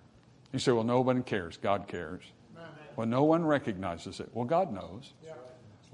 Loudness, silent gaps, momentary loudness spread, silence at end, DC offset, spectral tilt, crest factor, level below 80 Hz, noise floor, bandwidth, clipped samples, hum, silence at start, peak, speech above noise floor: -31 LUFS; none; 22 LU; 0.25 s; under 0.1%; -6.5 dB/octave; 20 dB; -68 dBFS; -59 dBFS; 11 kHz; under 0.1%; none; 0.5 s; -12 dBFS; 28 dB